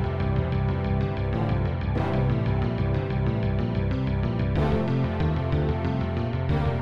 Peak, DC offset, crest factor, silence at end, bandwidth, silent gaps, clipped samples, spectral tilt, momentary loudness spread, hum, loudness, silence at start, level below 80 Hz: -12 dBFS; 0.4%; 12 dB; 0 s; 5.8 kHz; none; under 0.1%; -9.5 dB/octave; 2 LU; none; -26 LUFS; 0 s; -34 dBFS